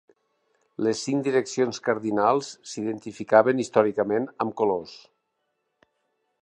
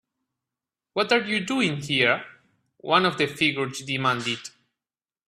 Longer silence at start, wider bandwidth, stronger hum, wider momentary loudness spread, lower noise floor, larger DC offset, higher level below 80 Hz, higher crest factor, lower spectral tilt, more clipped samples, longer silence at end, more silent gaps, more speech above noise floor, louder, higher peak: second, 0.8 s vs 0.95 s; second, 10 kHz vs 14.5 kHz; neither; about the same, 12 LU vs 10 LU; second, -77 dBFS vs under -90 dBFS; neither; about the same, -70 dBFS vs -66 dBFS; about the same, 22 dB vs 22 dB; about the same, -5 dB/octave vs -4 dB/octave; neither; first, 1.45 s vs 0.8 s; neither; second, 53 dB vs over 66 dB; about the same, -24 LUFS vs -24 LUFS; about the same, -4 dBFS vs -4 dBFS